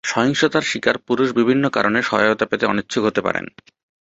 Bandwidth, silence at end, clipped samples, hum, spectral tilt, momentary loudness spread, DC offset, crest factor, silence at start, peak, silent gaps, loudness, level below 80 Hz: 8 kHz; 0.75 s; under 0.1%; none; -4.5 dB/octave; 4 LU; under 0.1%; 18 dB; 0.05 s; 0 dBFS; none; -18 LUFS; -56 dBFS